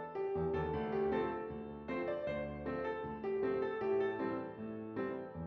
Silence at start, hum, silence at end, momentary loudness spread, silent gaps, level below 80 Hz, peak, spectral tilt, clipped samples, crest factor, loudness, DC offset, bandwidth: 0 s; none; 0 s; 8 LU; none; -62 dBFS; -24 dBFS; -6 dB/octave; under 0.1%; 14 dB; -39 LUFS; under 0.1%; 5.4 kHz